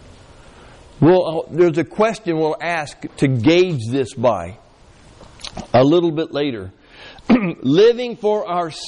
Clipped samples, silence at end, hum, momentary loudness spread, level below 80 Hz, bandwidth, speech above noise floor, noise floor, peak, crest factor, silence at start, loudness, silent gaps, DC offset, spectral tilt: under 0.1%; 0 s; none; 17 LU; -48 dBFS; 10.5 kHz; 30 dB; -47 dBFS; -4 dBFS; 14 dB; 1 s; -17 LUFS; none; under 0.1%; -6.5 dB/octave